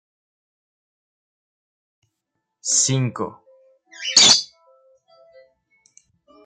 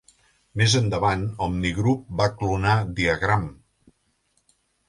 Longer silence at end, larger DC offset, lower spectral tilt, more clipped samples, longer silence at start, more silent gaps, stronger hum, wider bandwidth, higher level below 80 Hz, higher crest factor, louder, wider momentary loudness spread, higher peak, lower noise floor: first, 2 s vs 1.35 s; neither; second, -1.5 dB/octave vs -5 dB/octave; neither; first, 2.65 s vs 0.55 s; neither; neither; second, 10 kHz vs 11.5 kHz; second, -70 dBFS vs -42 dBFS; first, 24 dB vs 18 dB; first, -15 LUFS vs -23 LUFS; first, 20 LU vs 6 LU; first, 0 dBFS vs -6 dBFS; first, -79 dBFS vs -69 dBFS